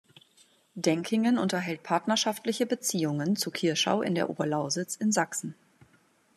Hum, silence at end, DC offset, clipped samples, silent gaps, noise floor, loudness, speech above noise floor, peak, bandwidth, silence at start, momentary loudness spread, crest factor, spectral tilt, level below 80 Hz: none; 0.85 s; under 0.1%; under 0.1%; none; -65 dBFS; -28 LUFS; 37 dB; -10 dBFS; 14 kHz; 0.75 s; 5 LU; 20 dB; -4 dB/octave; -76 dBFS